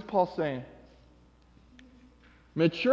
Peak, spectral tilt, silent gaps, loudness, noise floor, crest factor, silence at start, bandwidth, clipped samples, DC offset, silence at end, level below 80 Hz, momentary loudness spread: -10 dBFS; -7.5 dB/octave; none; -30 LUFS; -59 dBFS; 22 dB; 0 s; 7.4 kHz; under 0.1%; under 0.1%; 0 s; -62 dBFS; 13 LU